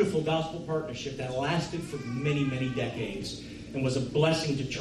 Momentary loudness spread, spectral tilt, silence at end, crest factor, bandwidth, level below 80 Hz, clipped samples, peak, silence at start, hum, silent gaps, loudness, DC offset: 10 LU; -6 dB/octave; 0 s; 16 dB; 13 kHz; -54 dBFS; under 0.1%; -14 dBFS; 0 s; none; none; -30 LUFS; under 0.1%